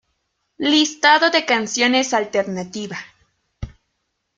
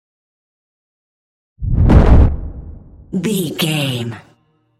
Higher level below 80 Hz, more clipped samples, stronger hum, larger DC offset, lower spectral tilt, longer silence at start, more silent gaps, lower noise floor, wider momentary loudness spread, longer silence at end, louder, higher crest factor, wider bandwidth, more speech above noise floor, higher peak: second, -48 dBFS vs -20 dBFS; neither; neither; neither; second, -2.5 dB/octave vs -6 dB/octave; second, 0.6 s vs 1.6 s; neither; first, -73 dBFS vs -57 dBFS; first, 23 LU vs 19 LU; about the same, 0.7 s vs 0.6 s; about the same, -17 LUFS vs -15 LUFS; about the same, 20 dB vs 16 dB; second, 9.4 kHz vs 15 kHz; first, 55 dB vs 38 dB; about the same, -2 dBFS vs 0 dBFS